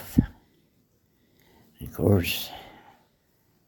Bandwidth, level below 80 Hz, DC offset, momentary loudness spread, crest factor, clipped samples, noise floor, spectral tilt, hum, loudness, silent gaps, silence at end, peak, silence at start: 19 kHz; -44 dBFS; under 0.1%; 21 LU; 26 dB; under 0.1%; -67 dBFS; -6 dB/octave; none; -27 LUFS; none; 1 s; -4 dBFS; 0 s